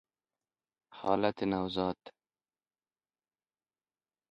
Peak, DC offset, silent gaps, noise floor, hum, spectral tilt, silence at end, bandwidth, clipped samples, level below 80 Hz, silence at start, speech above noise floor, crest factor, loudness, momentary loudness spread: -12 dBFS; under 0.1%; none; under -90 dBFS; none; -7.5 dB/octave; 2.2 s; 7.6 kHz; under 0.1%; -66 dBFS; 0.9 s; over 58 dB; 26 dB; -33 LUFS; 8 LU